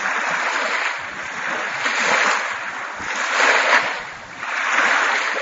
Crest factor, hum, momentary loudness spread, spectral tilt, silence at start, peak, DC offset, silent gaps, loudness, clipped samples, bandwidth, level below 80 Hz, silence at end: 20 dB; none; 12 LU; -0.5 dB/octave; 0 s; 0 dBFS; under 0.1%; none; -19 LUFS; under 0.1%; 8 kHz; -64 dBFS; 0 s